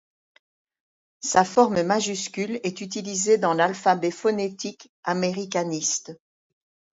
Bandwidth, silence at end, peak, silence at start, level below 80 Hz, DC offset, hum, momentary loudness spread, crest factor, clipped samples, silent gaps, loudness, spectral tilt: 8 kHz; 0.8 s; -4 dBFS; 1.2 s; -68 dBFS; under 0.1%; none; 12 LU; 22 dB; under 0.1%; 4.89-5.03 s; -24 LUFS; -3.5 dB/octave